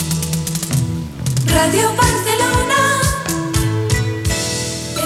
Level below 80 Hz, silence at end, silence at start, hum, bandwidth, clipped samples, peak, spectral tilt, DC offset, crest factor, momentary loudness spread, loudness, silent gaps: -30 dBFS; 0 s; 0 s; none; 16.5 kHz; under 0.1%; 0 dBFS; -4 dB/octave; under 0.1%; 16 dB; 7 LU; -16 LUFS; none